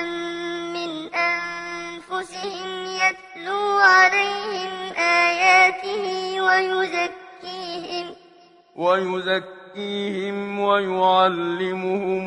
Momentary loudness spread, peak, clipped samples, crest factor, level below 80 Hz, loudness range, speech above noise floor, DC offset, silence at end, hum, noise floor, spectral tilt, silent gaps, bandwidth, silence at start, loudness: 16 LU; -4 dBFS; under 0.1%; 18 dB; -68 dBFS; 8 LU; 30 dB; under 0.1%; 0 s; none; -52 dBFS; -3.5 dB/octave; none; 11 kHz; 0 s; -21 LUFS